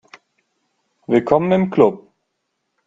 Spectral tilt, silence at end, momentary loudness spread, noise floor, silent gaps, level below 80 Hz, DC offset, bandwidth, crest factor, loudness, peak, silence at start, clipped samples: -8.5 dB/octave; 0.9 s; 19 LU; -74 dBFS; none; -56 dBFS; under 0.1%; 7.6 kHz; 20 dB; -16 LUFS; 0 dBFS; 1.1 s; under 0.1%